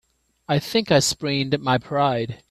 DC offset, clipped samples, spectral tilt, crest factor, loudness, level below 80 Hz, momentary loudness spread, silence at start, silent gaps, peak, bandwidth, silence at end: under 0.1%; under 0.1%; -4.5 dB/octave; 18 dB; -21 LUFS; -54 dBFS; 6 LU; 0.5 s; none; -4 dBFS; 14 kHz; 0.15 s